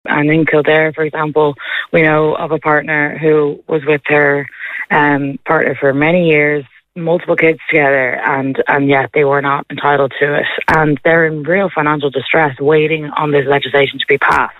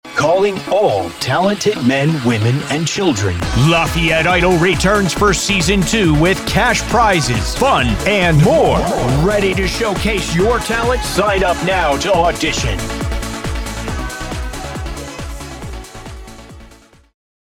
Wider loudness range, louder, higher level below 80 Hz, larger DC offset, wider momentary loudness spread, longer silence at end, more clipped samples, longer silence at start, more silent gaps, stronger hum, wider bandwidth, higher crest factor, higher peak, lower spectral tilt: second, 1 LU vs 11 LU; about the same, -13 LUFS vs -15 LUFS; second, -48 dBFS vs -28 dBFS; neither; second, 5 LU vs 13 LU; second, 0.05 s vs 0.8 s; neither; about the same, 0.05 s vs 0.05 s; neither; neither; second, 7.2 kHz vs 18 kHz; about the same, 12 dB vs 12 dB; about the same, 0 dBFS vs -2 dBFS; first, -7.5 dB/octave vs -4.5 dB/octave